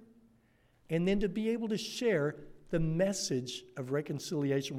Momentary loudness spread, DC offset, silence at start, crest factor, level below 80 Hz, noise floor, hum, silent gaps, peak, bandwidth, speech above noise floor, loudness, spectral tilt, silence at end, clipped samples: 6 LU; under 0.1%; 0 s; 16 dB; -52 dBFS; -68 dBFS; none; none; -18 dBFS; 15.5 kHz; 35 dB; -34 LUFS; -5.5 dB/octave; 0 s; under 0.1%